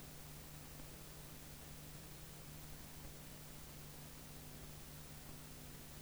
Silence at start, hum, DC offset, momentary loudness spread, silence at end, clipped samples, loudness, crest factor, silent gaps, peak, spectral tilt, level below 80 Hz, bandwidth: 0 s; 50 Hz at -60 dBFS; under 0.1%; 0 LU; 0 s; under 0.1%; -53 LUFS; 14 dB; none; -38 dBFS; -3.5 dB/octave; -62 dBFS; over 20 kHz